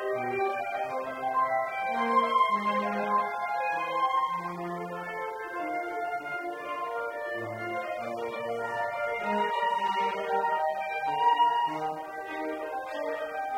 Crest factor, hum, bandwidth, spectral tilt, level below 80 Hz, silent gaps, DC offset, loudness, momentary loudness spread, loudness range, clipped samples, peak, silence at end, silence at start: 18 dB; none; 16 kHz; -4.5 dB/octave; -72 dBFS; none; under 0.1%; -30 LUFS; 10 LU; 6 LU; under 0.1%; -12 dBFS; 0 s; 0 s